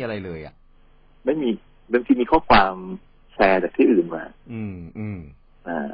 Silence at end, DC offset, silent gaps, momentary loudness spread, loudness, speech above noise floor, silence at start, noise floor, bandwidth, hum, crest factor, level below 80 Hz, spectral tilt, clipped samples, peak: 0 s; under 0.1%; none; 20 LU; -21 LUFS; 31 dB; 0 s; -52 dBFS; 5.6 kHz; none; 20 dB; -46 dBFS; -10.5 dB/octave; under 0.1%; -4 dBFS